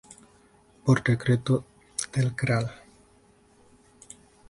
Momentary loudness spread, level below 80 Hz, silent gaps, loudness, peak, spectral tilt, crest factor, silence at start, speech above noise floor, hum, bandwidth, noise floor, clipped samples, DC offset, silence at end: 20 LU; -58 dBFS; none; -26 LUFS; -8 dBFS; -6 dB/octave; 20 dB; 0.85 s; 35 dB; none; 11.5 kHz; -59 dBFS; under 0.1%; under 0.1%; 1.75 s